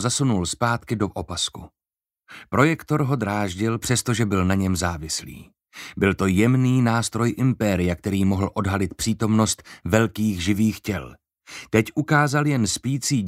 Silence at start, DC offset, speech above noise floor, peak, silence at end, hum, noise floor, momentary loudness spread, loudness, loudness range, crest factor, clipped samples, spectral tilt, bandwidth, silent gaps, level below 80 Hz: 0 s; under 0.1%; over 68 dB; -2 dBFS; 0 s; none; under -90 dBFS; 9 LU; -22 LUFS; 3 LU; 20 dB; under 0.1%; -5 dB/octave; 16 kHz; none; -48 dBFS